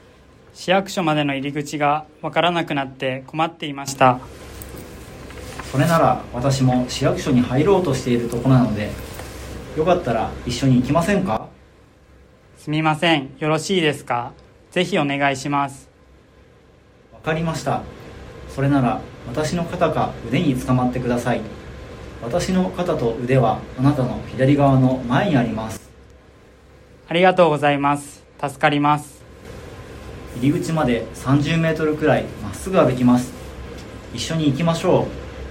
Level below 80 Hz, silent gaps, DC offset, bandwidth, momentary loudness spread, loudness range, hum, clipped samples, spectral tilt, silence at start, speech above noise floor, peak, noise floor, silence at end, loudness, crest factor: -42 dBFS; none; under 0.1%; 16.5 kHz; 19 LU; 4 LU; none; under 0.1%; -6 dB/octave; 0.55 s; 31 dB; -2 dBFS; -50 dBFS; 0 s; -20 LUFS; 18 dB